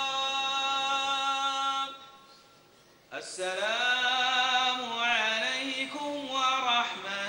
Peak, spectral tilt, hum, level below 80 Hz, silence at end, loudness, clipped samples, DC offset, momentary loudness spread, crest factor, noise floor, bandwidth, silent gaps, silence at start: -14 dBFS; 0 dB/octave; none; -76 dBFS; 0 s; -28 LUFS; under 0.1%; under 0.1%; 10 LU; 16 dB; -59 dBFS; 16 kHz; none; 0 s